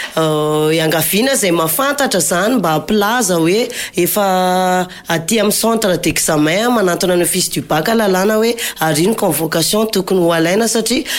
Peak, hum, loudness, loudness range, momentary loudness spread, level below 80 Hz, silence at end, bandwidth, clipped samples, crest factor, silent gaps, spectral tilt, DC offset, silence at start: -4 dBFS; none; -14 LUFS; 1 LU; 3 LU; -46 dBFS; 0 s; 17 kHz; under 0.1%; 10 dB; none; -3.5 dB/octave; under 0.1%; 0 s